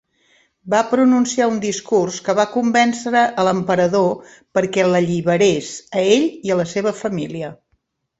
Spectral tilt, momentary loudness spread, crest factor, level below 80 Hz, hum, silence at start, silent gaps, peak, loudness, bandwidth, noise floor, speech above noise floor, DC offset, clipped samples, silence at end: -5 dB/octave; 9 LU; 16 dB; -58 dBFS; none; 0.65 s; none; -2 dBFS; -18 LUFS; 8.2 kHz; -67 dBFS; 50 dB; under 0.1%; under 0.1%; 0.65 s